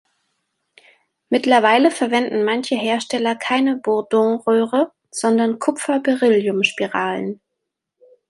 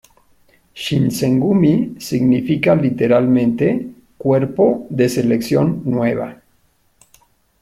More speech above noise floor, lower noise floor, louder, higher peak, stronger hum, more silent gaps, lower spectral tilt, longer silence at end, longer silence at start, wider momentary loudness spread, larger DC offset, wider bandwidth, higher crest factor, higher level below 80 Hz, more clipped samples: first, 62 dB vs 43 dB; first, -79 dBFS vs -59 dBFS; about the same, -18 LUFS vs -16 LUFS; about the same, -2 dBFS vs -2 dBFS; neither; neither; second, -4 dB/octave vs -7 dB/octave; second, 0.95 s vs 1.3 s; first, 1.3 s vs 0.75 s; about the same, 7 LU vs 8 LU; neither; second, 11.5 kHz vs 15.5 kHz; about the same, 18 dB vs 14 dB; second, -70 dBFS vs -52 dBFS; neither